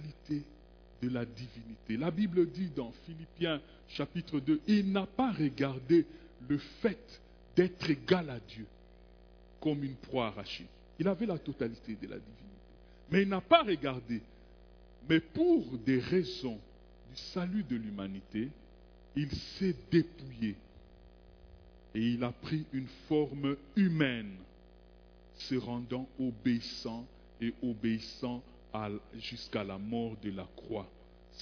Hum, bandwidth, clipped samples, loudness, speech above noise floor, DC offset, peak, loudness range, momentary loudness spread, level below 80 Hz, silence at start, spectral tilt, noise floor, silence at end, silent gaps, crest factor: 60 Hz at -60 dBFS; 5.4 kHz; under 0.1%; -34 LUFS; 24 dB; under 0.1%; -10 dBFS; 6 LU; 16 LU; -58 dBFS; 0 s; -5.5 dB/octave; -58 dBFS; 0 s; none; 26 dB